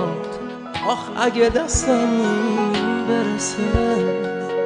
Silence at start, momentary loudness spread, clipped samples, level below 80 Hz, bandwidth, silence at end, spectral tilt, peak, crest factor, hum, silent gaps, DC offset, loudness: 0 s; 7 LU; under 0.1%; -36 dBFS; 10 kHz; 0 s; -4.5 dB/octave; -2 dBFS; 18 dB; none; none; under 0.1%; -20 LUFS